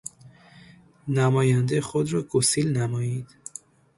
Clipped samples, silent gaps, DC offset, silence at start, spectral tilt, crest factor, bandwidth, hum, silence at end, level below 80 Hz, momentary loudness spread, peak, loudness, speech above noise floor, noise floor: under 0.1%; none; under 0.1%; 0.05 s; -5.5 dB/octave; 16 dB; 11.5 kHz; none; 0.75 s; -60 dBFS; 19 LU; -8 dBFS; -24 LUFS; 29 dB; -51 dBFS